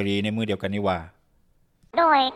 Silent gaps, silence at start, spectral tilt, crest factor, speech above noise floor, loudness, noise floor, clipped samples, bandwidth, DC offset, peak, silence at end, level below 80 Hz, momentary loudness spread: none; 0 s; -6 dB/octave; 18 dB; 40 dB; -24 LUFS; -62 dBFS; under 0.1%; 12.5 kHz; under 0.1%; -6 dBFS; 0 s; -56 dBFS; 9 LU